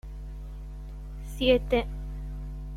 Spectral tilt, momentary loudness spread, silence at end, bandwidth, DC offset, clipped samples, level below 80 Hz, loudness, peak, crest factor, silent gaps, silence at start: -6.5 dB/octave; 18 LU; 0 s; 14.5 kHz; under 0.1%; under 0.1%; -36 dBFS; -28 LUFS; -10 dBFS; 20 dB; none; 0.05 s